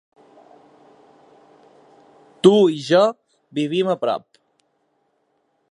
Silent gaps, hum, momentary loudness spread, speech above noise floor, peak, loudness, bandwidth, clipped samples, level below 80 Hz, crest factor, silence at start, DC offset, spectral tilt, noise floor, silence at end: none; none; 12 LU; 51 dB; 0 dBFS; -18 LUFS; 11 kHz; under 0.1%; -74 dBFS; 22 dB; 2.45 s; under 0.1%; -6 dB/octave; -68 dBFS; 1.55 s